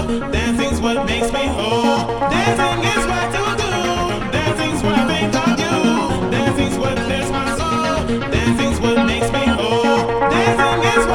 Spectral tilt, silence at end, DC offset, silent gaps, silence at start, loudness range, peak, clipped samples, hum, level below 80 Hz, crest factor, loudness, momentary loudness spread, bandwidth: -5 dB/octave; 0 s; under 0.1%; none; 0 s; 2 LU; -2 dBFS; under 0.1%; none; -32 dBFS; 16 dB; -17 LUFS; 4 LU; 17.5 kHz